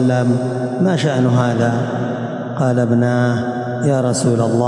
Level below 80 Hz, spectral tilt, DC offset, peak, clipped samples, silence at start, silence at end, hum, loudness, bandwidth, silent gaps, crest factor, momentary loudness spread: -60 dBFS; -7 dB/octave; under 0.1%; -4 dBFS; under 0.1%; 0 s; 0 s; none; -17 LUFS; 11.5 kHz; none; 10 dB; 6 LU